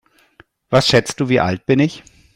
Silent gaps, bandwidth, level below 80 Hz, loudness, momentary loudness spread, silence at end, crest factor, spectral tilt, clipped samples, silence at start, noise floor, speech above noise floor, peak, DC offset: none; 15.5 kHz; -48 dBFS; -16 LUFS; 5 LU; 0.35 s; 18 dB; -5 dB/octave; under 0.1%; 0.7 s; -52 dBFS; 36 dB; 0 dBFS; under 0.1%